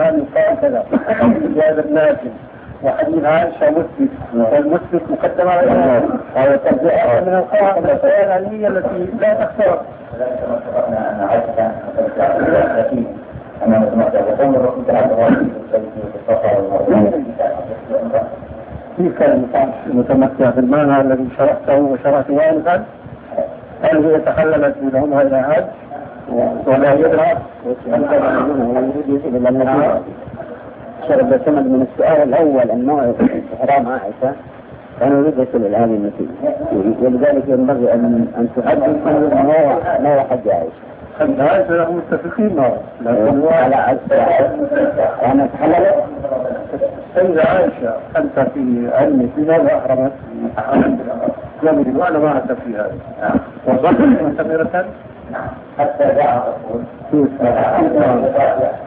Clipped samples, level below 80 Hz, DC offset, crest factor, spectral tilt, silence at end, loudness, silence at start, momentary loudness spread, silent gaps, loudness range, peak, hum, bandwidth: under 0.1%; -46 dBFS; under 0.1%; 14 dB; -12 dB/octave; 0 s; -15 LUFS; 0 s; 10 LU; none; 3 LU; 0 dBFS; none; 3.9 kHz